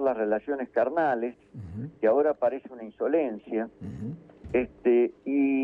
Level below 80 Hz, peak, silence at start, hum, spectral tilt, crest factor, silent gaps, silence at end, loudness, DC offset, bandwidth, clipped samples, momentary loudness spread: -58 dBFS; -12 dBFS; 0 s; none; -9.5 dB/octave; 14 dB; none; 0 s; -27 LUFS; under 0.1%; 4.7 kHz; under 0.1%; 15 LU